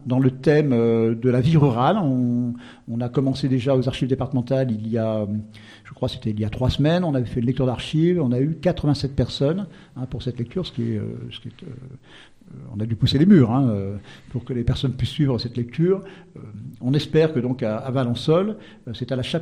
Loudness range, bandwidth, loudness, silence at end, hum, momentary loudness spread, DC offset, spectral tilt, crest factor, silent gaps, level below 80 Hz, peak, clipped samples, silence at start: 5 LU; 10.5 kHz; -22 LUFS; 0 s; none; 17 LU; under 0.1%; -8 dB/octave; 18 dB; none; -44 dBFS; -4 dBFS; under 0.1%; 0 s